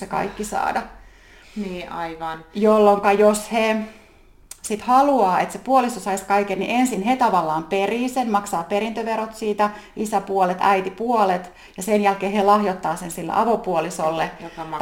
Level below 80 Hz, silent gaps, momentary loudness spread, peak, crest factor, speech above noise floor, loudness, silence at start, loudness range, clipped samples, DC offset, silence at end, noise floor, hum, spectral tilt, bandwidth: -52 dBFS; none; 13 LU; -2 dBFS; 18 dB; 29 dB; -21 LUFS; 0 s; 3 LU; under 0.1%; under 0.1%; 0 s; -50 dBFS; none; -5 dB/octave; 17 kHz